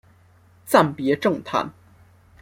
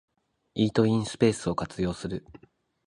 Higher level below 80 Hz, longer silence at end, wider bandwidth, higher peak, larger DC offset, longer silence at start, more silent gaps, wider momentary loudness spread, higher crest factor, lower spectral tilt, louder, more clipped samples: second, -62 dBFS vs -52 dBFS; about the same, 0.7 s vs 0.65 s; first, 16.5 kHz vs 11 kHz; first, -2 dBFS vs -8 dBFS; neither; about the same, 0.65 s vs 0.55 s; neither; second, 8 LU vs 12 LU; about the same, 20 dB vs 20 dB; about the same, -5.5 dB/octave vs -6.5 dB/octave; first, -21 LUFS vs -27 LUFS; neither